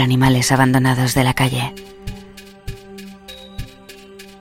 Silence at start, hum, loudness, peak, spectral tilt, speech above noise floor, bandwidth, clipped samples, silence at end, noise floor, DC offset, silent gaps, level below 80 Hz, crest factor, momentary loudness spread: 0 s; none; -16 LUFS; 0 dBFS; -5 dB/octave; 25 dB; 16.5 kHz; under 0.1%; 0.1 s; -40 dBFS; under 0.1%; none; -38 dBFS; 18 dB; 23 LU